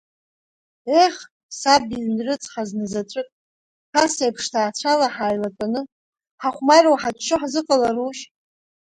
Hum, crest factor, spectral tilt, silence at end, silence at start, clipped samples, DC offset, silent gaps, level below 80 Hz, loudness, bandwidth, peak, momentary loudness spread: none; 20 dB; -3 dB/octave; 0.65 s; 0.85 s; under 0.1%; under 0.1%; 1.31-1.49 s, 3.32-3.93 s, 5.92-6.13 s, 6.31-6.38 s; -60 dBFS; -20 LUFS; 10.5 kHz; 0 dBFS; 14 LU